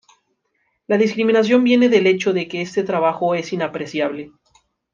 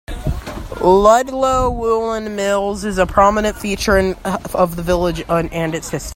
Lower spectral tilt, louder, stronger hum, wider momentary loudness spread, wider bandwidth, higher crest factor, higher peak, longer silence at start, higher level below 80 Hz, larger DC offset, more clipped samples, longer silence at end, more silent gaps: about the same, -5.5 dB/octave vs -5 dB/octave; about the same, -18 LUFS vs -16 LUFS; neither; about the same, 10 LU vs 11 LU; second, 7.4 kHz vs 16.5 kHz; about the same, 16 dB vs 16 dB; about the same, -2 dBFS vs 0 dBFS; first, 0.9 s vs 0.1 s; second, -66 dBFS vs -30 dBFS; neither; neither; first, 0.65 s vs 0 s; neither